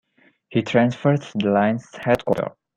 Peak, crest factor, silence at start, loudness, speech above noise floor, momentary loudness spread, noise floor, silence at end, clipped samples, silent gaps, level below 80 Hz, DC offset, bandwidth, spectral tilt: -4 dBFS; 18 dB; 0.5 s; -21 LUFS; 33 dB; 7 LU; -53 dBFS; 0.25 s; under 0.1%; none; -56 dBFS; under 0.1%; 13.5 kHz; -7.5 dB/octave